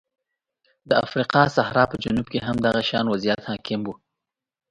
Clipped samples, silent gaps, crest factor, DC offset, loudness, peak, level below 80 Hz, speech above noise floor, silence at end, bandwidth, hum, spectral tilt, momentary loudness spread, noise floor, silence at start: under 0.1%; none; 22 dB; under 0.1%; -22 LUFS; -2 dBFS; -52 dBFS; 63 dB; 0.75 s; 10.5 kHz; none; -6 dB/octave; 9 LU; -85 dBFS; 0.85 s